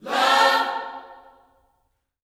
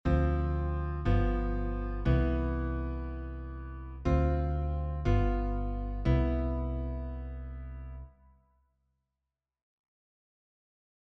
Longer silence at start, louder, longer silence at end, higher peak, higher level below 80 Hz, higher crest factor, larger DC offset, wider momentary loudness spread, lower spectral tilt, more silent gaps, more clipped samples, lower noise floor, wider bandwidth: about the same, 0.05 s vs 0.05 s; first, -19 LUFS vs -32 LUFS; second, 1.25 s vs 3 s; first, -4 dBFS vs -14 dBFS; second, -72 dBFS vs -34 dBFS; about the same, 20 dB vs 18 dB; neither; first, 20 LU vs 14 LU; second, -0.5 dB/octave vs -9.5 dB/octave; neither; neither; second, -71 dBFS vs -89 dBFS; first, 17 kHz vs 6.2 kHz